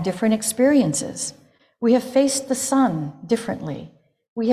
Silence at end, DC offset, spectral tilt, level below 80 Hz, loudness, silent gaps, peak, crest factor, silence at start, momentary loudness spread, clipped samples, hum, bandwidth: 0 s; under 0.1%; -4.5 dB/octave; -60 dBFS; -21 LUFS; 4.28-4.36 s; -6 dBFS; 16 dB; 0 s; 13 LU; under 0.1%; none; 15.5 kHz